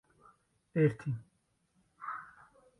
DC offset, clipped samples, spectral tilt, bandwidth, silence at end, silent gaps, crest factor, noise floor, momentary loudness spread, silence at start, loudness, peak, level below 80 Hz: under 0.1%; under 0.1%; -9.5 dB/octave; 11 kHz; 0.55 s; none; 22 dB; -76 dBFS; 16 LU; 0.75 s; -35 LUFS; -16 dBFS; -72 dBFS